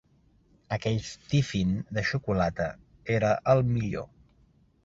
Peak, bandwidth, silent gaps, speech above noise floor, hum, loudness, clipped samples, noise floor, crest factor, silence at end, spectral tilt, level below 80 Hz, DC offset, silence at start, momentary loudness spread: -8 dBFS; 7.8 kHz; none; 36 dB; none; -28 LUFS; under 0.1%; -63 dBFS; 20 dB; 0.8 s; -6.5 dB/octave; -50 dBFS; under 0.1%; 0.7 s; 11 LU